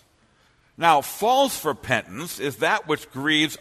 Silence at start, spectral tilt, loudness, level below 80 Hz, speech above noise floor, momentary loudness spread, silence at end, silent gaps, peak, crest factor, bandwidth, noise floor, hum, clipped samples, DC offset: 0.8 s; -3 dB/octave; -22 LUFS; -60 dBFS; 38 dB; 9 LU; 0.05 s; none; -2 dBFS; 22 dB; 13.5 kHz; -61 dBFS; none; under 0.1%; under 0.1%